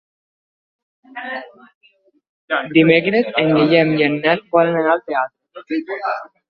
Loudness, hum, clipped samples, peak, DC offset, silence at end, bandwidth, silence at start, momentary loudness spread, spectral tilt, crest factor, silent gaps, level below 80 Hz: -17 LUFS; none; under 0.1%; -2 dBFS; under 0.1%; 0.25 s; 5.4 kHz; 1.15 s; 15 LU; -9 dB/octave; 18 dB; 1.74-1.81 s, 2.29-2.48 s; -62 dBFS